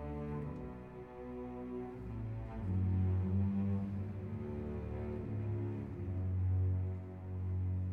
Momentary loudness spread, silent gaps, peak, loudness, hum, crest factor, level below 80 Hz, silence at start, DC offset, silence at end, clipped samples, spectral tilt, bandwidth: 11 LU; none; -26 dBFS; -39 LUFS; none; 12 dB; -52 dBFS; 0 s; under 0.1%; 0 s; under 0.1%; -11 dB/octave; 3.3 kHz